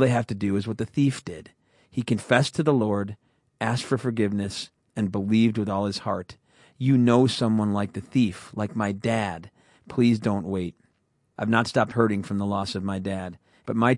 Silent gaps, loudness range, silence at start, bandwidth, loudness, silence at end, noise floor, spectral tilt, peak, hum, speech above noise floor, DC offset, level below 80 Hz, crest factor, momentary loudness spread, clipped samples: none; 3 LU; 0 s; 11.5 kHz; -25 LUFS; 0 s; -70 dBFS; -6.5 dB/octave; -4 dBFS; none; 46 dB; under 0.1%; -64 dBFS; 22 dB; 12 LU; under 0.1%